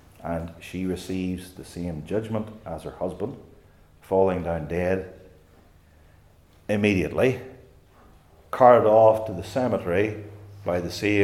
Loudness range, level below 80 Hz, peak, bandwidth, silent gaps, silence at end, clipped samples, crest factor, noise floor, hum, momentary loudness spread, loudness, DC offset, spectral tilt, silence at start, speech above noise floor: 10 LU; -54 dBFS; -2 dBFS; 15.5 kHz; none; 0 s; under 0.1%; 22 dB; -55 dBFS; none; 19 LU; -24 LUFS; under 0.1%; -7 dB/octave; 0.2 s; 32 dB